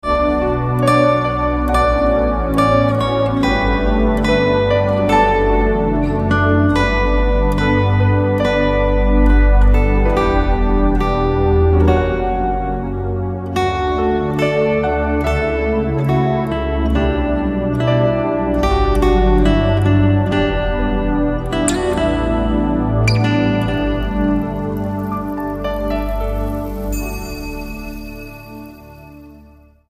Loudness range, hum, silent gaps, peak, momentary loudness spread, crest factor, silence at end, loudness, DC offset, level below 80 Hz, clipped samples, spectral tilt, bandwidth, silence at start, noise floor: 6 LU; none; none; 0 dBFS; 8 LU; 14 dB; 0.6 s; -16 LUFS; under 0.1%; -20 dBFS; under 0.1%; -7 dB/octave; 15.5 kHz; 0.05 s; -45 dBFS